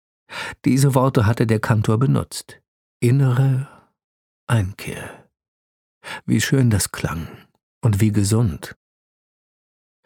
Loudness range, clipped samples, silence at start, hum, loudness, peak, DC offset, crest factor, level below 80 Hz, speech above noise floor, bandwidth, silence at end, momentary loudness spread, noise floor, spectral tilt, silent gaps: 5 LU; under 0.1%; 0.3 s; none; -19 LUFS; -2 dBFS; under 0.1%; 20 dB; -46 dBFS; over 72 dB; 17.5 kHz; 1.35 s; 18 LU; under -90 dBFS; -6 dB/octave; 2.68-3.00 s, 4.04-4.47 s, 5.48-6.01 s, 7.63-7.81 s